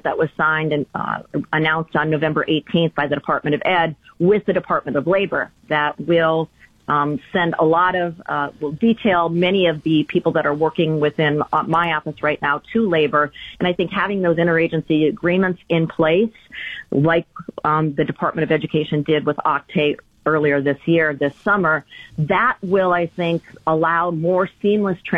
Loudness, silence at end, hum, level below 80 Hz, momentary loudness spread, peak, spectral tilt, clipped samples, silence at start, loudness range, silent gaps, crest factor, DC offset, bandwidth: -19 LUFS; 0 s; none; -54 dBFS; 6 LU; -6 dBFS; -8.5 dB/octave; under 0.1%; 0.05 s; 2 LU; none; 14 dB; under 0.1%; 5.4 kHz